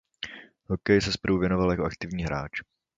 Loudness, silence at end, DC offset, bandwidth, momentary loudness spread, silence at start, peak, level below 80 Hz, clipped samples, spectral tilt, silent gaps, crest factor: -27 LUFS; 0.35 s; under 0.1%; 7.8 kHz; 15 LU; 0.2 s; -6 dBFS; -44 dBFS; under 0.1%; -6 dB/octave; none; 20 dB